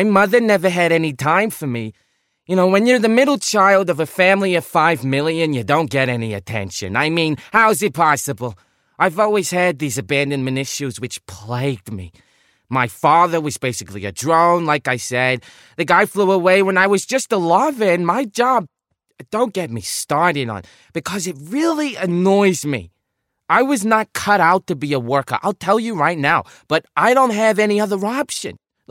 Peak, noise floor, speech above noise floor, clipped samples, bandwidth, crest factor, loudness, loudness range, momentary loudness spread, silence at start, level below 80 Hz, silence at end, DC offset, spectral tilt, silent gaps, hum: 0 dBFS; -75 dBFS; 58 dB; under 0.1%; 16.5 kHz; 16 dB; -17 LUFS; 5 LU; 11 LU; 0 s; -58 dBFS; 0.35 s; under 0.1%; -4.5 dB/octave; none; none